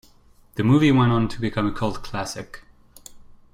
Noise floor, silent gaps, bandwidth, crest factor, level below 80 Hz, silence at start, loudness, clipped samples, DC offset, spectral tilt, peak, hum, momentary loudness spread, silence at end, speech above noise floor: -53 dBFS; none; 15.5 kHz; 16 dB; -44 dBFS; 0.55 s; -21 LUFS; under 0.1%; under 0.1%; -6.5 dB/octave; -6 dBFS; none; 18 LU; 0.2 s; 32 dB